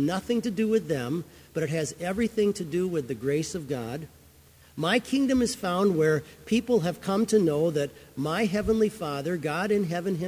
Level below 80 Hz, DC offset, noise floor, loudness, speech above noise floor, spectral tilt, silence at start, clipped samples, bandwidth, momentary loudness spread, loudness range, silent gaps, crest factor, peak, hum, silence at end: -54 dBFS; under 0.1%; -55 dBFS; -27 LUFS; 28 dB; -5.5 dB/octave; 0 s; under 0.1%; 16 kHz; 9 LU; 4 LU; none; 18 dB; -10 dBFS; none; 0 s